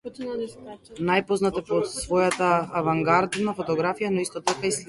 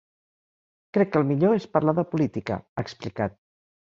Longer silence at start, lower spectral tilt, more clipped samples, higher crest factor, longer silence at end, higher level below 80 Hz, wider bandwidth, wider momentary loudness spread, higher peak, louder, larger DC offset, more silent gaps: second, 0.05 s vs 0.95 s; second, -4.5 dB/octave vs -8.5 dB/octave; neither; about the same, 18 dB vs 20 dB; second, 0.05 s vs 0.65 s; about the same, -56 dBFS vs -58 dBFS; first, 11.5 kHz vs 7.6 kHz; about the same, 11 LU vs 10 LU; about the same, -6 dBFS vs -6 dBFS; about the same, -24 LUFS vs -25 LUFS; neither; second, none vs 2.69-2.76 s